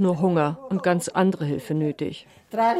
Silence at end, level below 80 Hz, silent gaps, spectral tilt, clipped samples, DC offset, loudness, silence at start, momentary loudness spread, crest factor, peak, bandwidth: 0 s; -64 dBFS; none; -6.5 dB/octave; under 0.1%; under 0.1%; -24 LUFS; 0 s; 11 LU; 16 dB; -8 dBFS; 14 kHz